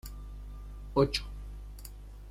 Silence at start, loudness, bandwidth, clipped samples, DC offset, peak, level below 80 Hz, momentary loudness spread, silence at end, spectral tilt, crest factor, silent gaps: 0.05 s; -31 LUFS; 16.5 kHz; under 0.1%; under 0.1%; -12 dBFS; -42 dBFS; 19 LU; 0 s; -5.5 dB/octave; 22 dB; none